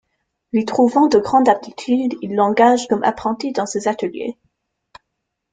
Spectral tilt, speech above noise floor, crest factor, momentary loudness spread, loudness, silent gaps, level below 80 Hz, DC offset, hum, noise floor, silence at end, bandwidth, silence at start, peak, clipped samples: -5 dB/octave; 60 dB; 18 dB; 9 LU; -17 LUFS; none; -58 dBFS; under 0.1%; none; -77 dBFS; 1.2 s; 9.4 kHz; 0.55 s; 0 dBFS; under 0.1%